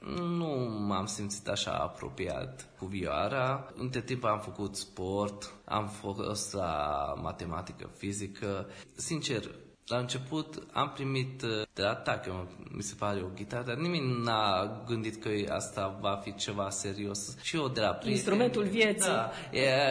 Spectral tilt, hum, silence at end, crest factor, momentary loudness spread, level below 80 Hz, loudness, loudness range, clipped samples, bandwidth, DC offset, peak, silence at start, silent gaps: -4.5 dB/octave; none; 0 s; 20 dB; 10 LU; -58 dBFS; -33 LUFS; 5 LU; under 0.1%; 11 kHz; under 0.1%; -14 dBFS; 0 s; none